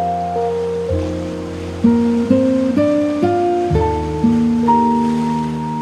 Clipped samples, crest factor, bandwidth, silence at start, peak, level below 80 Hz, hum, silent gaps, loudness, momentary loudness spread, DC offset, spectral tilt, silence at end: under 0.1%; 14 dB; 10.5 kHz; 0 s; -2 dBFS; -34 dBFS; none; none; -17 LUFS; 7 LU; under 0.1%; -8 dB/octave; 0 s